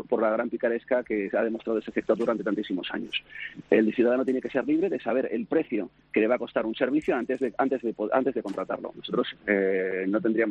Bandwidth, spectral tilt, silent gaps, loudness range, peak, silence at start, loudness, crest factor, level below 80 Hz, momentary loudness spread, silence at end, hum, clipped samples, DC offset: 8.2 kHz; -7 dB/octave; none; 2 LU; -8 dBFS; 0 s; -27 LUFS; 20 dB; -66 dBFS; 8 LU; 0 s; none; under 0.1%; under 0.1%